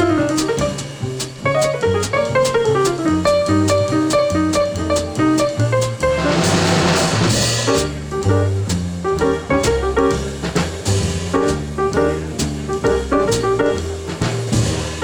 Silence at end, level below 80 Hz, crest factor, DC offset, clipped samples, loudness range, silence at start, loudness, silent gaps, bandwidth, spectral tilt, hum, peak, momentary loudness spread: 0 s; -34 dBFS; 14 dB; under 0.1%; under 0.1%; 3 LU; 0 s; -17 LUFS; none; over 20 kHz; -5 dB/octave; none; -2 dBFS; 6 LU